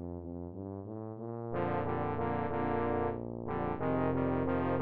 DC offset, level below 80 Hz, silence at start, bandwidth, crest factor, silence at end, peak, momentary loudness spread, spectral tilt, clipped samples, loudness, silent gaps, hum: under 0.1%; -54 dBFS; 0 s; 4.7 kHz; 16 dB; 0 s; -18 dBFS; 11 LU; -8 dB/octave; under 0.1%; -35 LUFS; none; none